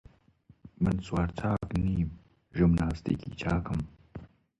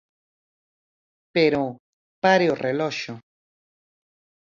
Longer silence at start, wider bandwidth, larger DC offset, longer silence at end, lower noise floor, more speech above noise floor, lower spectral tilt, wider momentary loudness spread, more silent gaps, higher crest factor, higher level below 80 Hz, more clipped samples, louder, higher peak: second, 0.65 s vs 1.35 s; first, 9.6 kHz vs 7.4 kHz; neither; second, 0.35 s vs 1.25 s; second, -62 dBFS vs under -90 dBFS; second, 33 dB vs over 69 dB; first, -8.5 dB/octave vs -5.5 dB/octave; about the same, 15 LU vs 13 LU; second, none vs 1.79-2.22 s; second, 16 dB vs 22 dB; first, -42 dBFS vs -66 dBFS; neither; second, -31 LUFS vs -22 LUFS; second, -14 dBFS vs -4 dBFS